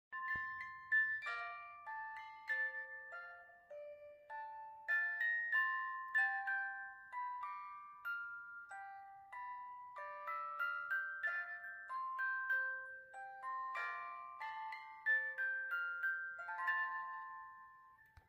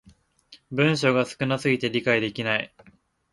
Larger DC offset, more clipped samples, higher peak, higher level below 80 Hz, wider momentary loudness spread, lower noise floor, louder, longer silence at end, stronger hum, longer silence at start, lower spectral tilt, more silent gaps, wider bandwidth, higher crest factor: neither; neither; second, -28 dBFS vs -6 dBFS; second, -84 dBFS vs -62 dBFS; first, 16 LU vs 6 LU; first, -65 dBFS vs -55 dBFS; second, -41 LUFS vs -24 LUFS; second, 0.1 s vs 0.65 s; neither; second, 0.1 s vs 0.5 s; second, -2 dB/octave vs -5.5 dB/octave; neither; first, 15 kHz vs 11.5 kHz; about the same, 16 dB vs 20 dB